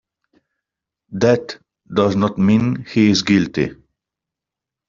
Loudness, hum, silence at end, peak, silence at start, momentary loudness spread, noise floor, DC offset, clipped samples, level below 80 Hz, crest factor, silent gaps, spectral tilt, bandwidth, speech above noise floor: -17 LUFS; none; 1.15 s; -2 dBFS; 1.1 s; 11 LU; -86 dBFS; under 0.1%; under 0.1%; -52 dBFS; 16 dB; none; -5.5 dB/octave; 7.4 kHz; 70 dB